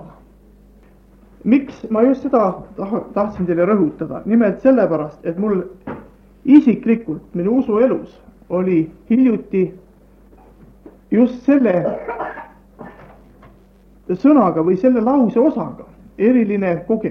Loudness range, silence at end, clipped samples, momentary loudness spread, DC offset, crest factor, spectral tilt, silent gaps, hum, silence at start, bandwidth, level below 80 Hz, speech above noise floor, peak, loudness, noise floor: 4 LU; 0 s; under 0.1%; 13 LU; under 0.1%; 18 dB; -10 dB/octave; none; none; 0 s; 6 kHz; -50 dBFS; 32 dB; 0 dBFS; -17 LUFS; -48 dBFS